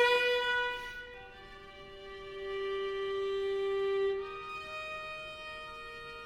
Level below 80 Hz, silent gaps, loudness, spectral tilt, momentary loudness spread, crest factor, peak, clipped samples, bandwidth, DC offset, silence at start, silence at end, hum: -60 dBFS; none; -35 LUFS; -3 dB/octave; 19 LU; 20 dB; -16 dBFS; under 0.1%; 13 kHz; under 0.1%; 0 s; 0 s; none